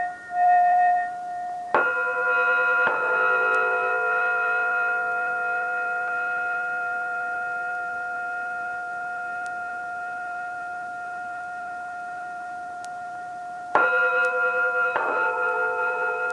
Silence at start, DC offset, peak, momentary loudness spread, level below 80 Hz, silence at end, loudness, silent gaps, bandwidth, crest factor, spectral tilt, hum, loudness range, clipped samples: 0 s; under 0.1%; -6 dBFS; 13 LU; -72 dBFS; 0 s; -24 LUFS; none; 11 kHz; 18 dB; -3.5 dB/octave; none; 11 LU; under 0.1%